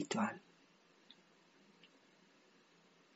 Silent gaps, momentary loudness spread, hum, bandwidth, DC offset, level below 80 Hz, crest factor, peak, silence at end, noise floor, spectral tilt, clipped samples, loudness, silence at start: none; 28 LU; none; 7.6 kHz; under 0.1%; under -90 dBFS; 24 dB; -24 dBFS; 1.3 s; -69 dBFS; -4 dB/octave; under 0.1%; -41 LUFS; 0 s